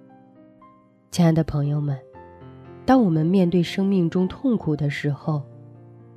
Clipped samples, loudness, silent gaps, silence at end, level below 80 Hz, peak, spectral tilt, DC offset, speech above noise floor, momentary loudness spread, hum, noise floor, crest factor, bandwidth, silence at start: under 0.1%; -22 LUFS; none; 0.55 s; -50 dBFS; -4 dBFS; -7.5 dB/octave; under 0.1%; 32 dB; 11 LU; none; -53 dBFS; 18 dB; 13 kHz; 1.1 s